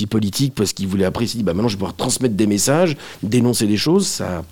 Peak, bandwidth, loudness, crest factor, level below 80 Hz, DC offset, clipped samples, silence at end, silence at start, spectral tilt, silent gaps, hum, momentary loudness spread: -4 dBFS; 17.5 kHz; -18 LUFS; 14 dB; -48 dBFS; 0.6%; under 0.1%; 0 s; 0 s; -5 dB/octave; none; none; 5 LU